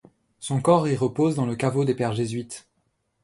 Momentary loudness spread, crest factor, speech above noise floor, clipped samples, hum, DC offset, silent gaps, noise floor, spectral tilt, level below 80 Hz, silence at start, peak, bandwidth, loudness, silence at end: 15 LU; 18 dB; 49 dB; under 0.1%; none; under 0.1%; none; -72 dBFS; -6.5 dB/octave; -60 dBFS; 0.4 s; -6 dBFS; 11.5 kHz; -24 LUFS; 0.65 s